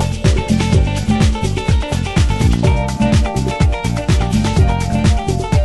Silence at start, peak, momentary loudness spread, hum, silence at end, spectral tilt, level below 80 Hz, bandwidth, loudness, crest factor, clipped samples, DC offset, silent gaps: 0 s; 0 dBFS; 3 LU; none; 0 s; -6 dB/octave; -20 dBFS; 12.5 kHz; -15 LUFS; 14 dB; under 0.1%; under 0.1%; none